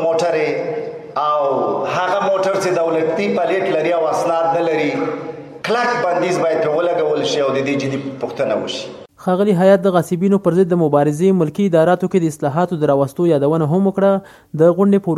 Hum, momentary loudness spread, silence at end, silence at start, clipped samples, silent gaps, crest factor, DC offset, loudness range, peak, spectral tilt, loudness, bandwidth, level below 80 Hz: none; 8 LU; 0 s; 0 s; under 0.1%; none; 16 dB; under 0.1%; 3 LU; 0 dBFS; -6.5 dB/octave; -17 LUFS; 14 kHz; -60 dBFS